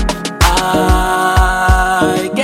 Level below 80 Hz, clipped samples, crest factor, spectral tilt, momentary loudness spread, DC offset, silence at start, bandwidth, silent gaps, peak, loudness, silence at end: -18 dBFS; under 0.1%; 12 dB; -4.5 dB/octave; 2 LU; under 0.1%; 0 s; 16.5 kHz; none; 0 dBFS; -12 LUFS; 0 s